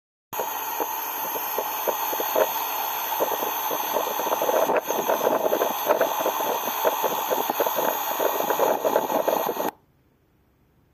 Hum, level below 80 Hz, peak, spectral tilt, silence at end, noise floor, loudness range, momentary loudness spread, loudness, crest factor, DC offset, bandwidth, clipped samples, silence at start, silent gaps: none; -70 dBFS; -4 dBFS; -2 dB/octave; 1.2 s; -63 dBFS; 2 LU; 5 LU; -24 LUFS; 22 dB; under 0.1%; 15.5 kHz; under 0.1%; 0.3 s; none